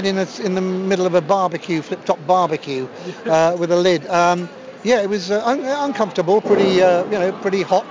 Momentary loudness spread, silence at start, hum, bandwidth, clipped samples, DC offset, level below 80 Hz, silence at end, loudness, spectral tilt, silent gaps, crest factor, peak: 8 LU; 0 s; none; 7.6 kHz; under 0.1%; under 0.1%; -62 dBFS; 0 s; -18 LUFS; -5.5 dB/octave; none; 14 dB; -4 dBFS